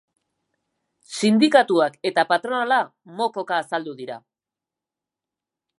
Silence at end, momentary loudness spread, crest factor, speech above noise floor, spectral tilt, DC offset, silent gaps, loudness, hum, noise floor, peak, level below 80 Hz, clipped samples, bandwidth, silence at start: 1.6 s; 18 LU; 22 dB; 68 dB; -4.5 dB/octave; under 0.1%; none; -21 LUFS; none; -89 dBFS; -2 dBFS; -78 dBFS; under 0.1%; 11.5 kHz; 1.1 s